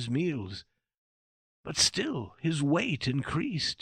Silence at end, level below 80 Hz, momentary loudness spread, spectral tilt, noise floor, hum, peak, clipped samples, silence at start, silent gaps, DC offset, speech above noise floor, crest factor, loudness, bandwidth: 0.05 s; -58 dBFS; 14 LU; -4 dB/octave; under -90 dBFS; none; -10 dBFS; under 0.1%; 0 s; 0.98-1.64 s; under 0.1%; over 60 dB; 22 dB; -29 LUFS; 15 kHz